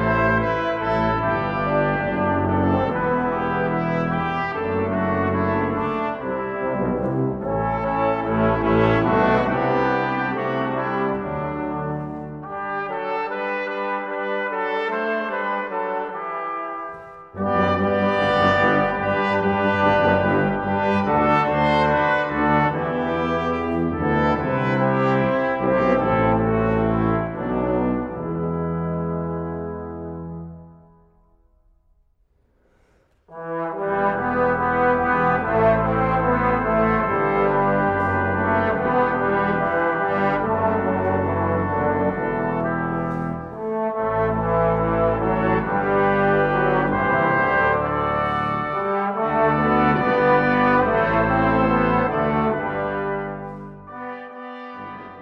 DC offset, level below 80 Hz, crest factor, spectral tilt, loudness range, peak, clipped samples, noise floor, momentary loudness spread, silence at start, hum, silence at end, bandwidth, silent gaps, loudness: under 0.1%; -42 dBFS; 16 dB; -8.5 dB/octave; 7 LU; -4 dBFS; under 0.1%; -62 dBFS; 10 LU; 0 s; none; 0 s; 7.6 kHz; none; -21 LUFS